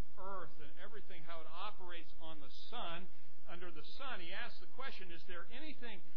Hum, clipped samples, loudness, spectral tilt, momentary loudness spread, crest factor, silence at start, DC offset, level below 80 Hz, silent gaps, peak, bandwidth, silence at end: none; under 0.1%; -51 LUFS; -6 dB/octave; 9 LU; 18 dB; 0 s; 4%; -64 dBFS; none; -24 dBFS; 5.4 kHz; 0 s